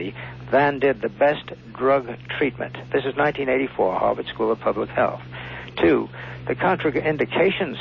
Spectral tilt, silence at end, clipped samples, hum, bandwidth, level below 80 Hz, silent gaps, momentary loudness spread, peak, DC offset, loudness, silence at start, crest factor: -8 dB/octave; 0 s; under 0.1%; none; 6.2 kHz; -50 dBFS; none; 13 LU; -8 dBFS; under 0.1%; -22 LUFS; 0 s; 14 dB